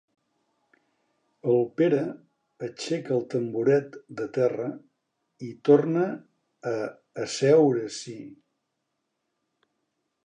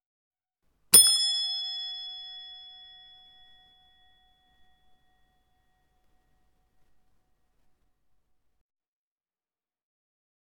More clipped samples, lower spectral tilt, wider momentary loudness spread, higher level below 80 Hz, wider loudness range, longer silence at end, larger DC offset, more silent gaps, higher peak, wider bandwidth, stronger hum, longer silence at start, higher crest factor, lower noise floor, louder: neither; first, -6 dB/octave vs 2 dB/octave; second, 20 LU vs 27 LU; second, -78 dBFS vs -70 dBFS; second, 4 LU vs 23 LU; second, 1.9 s vs 7.95 s; neither; neither; second, -6 dBFS vs -2 dBFS; second, 10 kHz vs 18 kHz; neither; first, 1.45 s vs 0.9 s; second, 22 dB vs 32 dB; second, -80 dBFS vs under -90 dBFS; second, -25 LUFS vs -20 LUFS